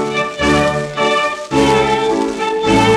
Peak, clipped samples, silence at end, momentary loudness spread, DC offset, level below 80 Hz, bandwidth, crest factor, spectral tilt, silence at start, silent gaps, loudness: -2 dBFS; under 0.1%; 0 s; 5 LU; under 0.1%; -36 dBFS; 13 kHz; 12 dB; -4.5 dB/octave; 0 s; none; -15 LUFS